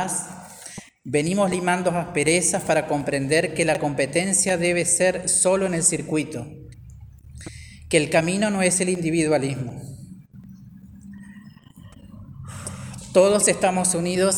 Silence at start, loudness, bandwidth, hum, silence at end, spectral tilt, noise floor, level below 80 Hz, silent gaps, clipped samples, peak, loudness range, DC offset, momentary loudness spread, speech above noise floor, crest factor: 0 s; -21 LUFS; over 20 kHz; none; 0 s; -3.5 dB/octave; -46 dBFS; -52 dBFS; none; under 0.1%; -2 dBFS; 9 LU; under 0.1%; 21 LU; 25 dB; 22 dB